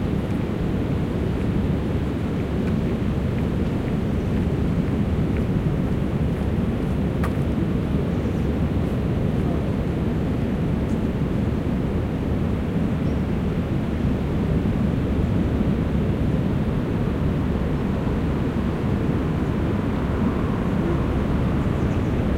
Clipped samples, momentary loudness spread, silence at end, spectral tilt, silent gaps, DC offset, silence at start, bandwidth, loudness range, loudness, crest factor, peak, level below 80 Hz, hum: under 0.1%; 2 LU; 0 s; -9 dB/octave; none; under 0.1%; 0 s; 15.5 kHz; 1 LU; -23 LUFS; 14 dB; -8 dBFS; -30 dBFS; none